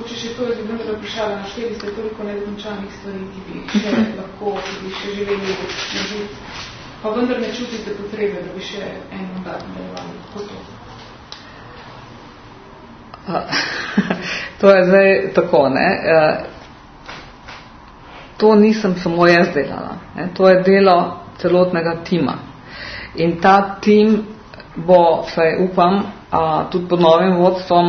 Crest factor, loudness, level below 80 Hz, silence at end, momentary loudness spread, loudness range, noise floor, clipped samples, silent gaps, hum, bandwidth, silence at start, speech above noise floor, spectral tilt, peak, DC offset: 18 dB; -16 LUFS; -48 dBFS; 0 s; 23 LU; 13 LU; -40 dBFS; under 0.1%; none; none; 6.6 kHz; 0 s; 23 dB; -6 dB/octave; 0 dBFS; under 0.1%